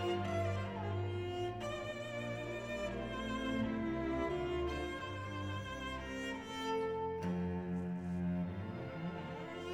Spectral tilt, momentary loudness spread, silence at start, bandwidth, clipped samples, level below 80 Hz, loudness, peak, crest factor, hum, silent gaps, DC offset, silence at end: -6.5 dB/octave; 5 LU; 0 s; 12.5 kHz; under 0.1%; -56 dBFS; -40 LUFS; -24 dBFS; 16 dB; none; none; under 0.1%; 0 s